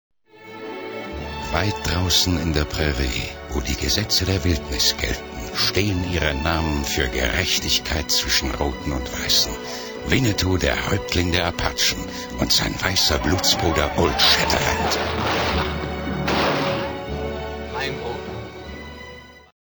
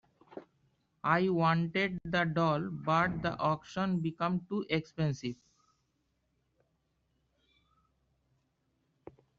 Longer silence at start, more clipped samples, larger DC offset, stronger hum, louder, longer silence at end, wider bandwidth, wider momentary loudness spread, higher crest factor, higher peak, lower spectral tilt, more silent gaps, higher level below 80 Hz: about the same, 0.35 s vs 0.35 s; neither; neither; neither; first, -21 LUFS vs -32 LUFS; second, 0.35 s vs 4.05 s; first, over 20 kHz vs 7.2 kHz; about the same, 13 LU vs 13 LU; about the same, 20 dB vs 22 dB; first, -2 dBFS vs -12 dBFS; second, -3.5 dB/octave vs -5 dB/octave; neither; first, -32 dBFS vs -64 dBFS